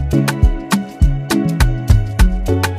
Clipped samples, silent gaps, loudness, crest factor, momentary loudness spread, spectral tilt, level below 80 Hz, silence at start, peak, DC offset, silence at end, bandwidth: under 0.1%; none; -16 LUFS; 14 dB; 3 LU; -6 dB/octave; -16 dBFS; 0 s; 0 dBFS; under 0.1%; 0 s; 15.5 kHz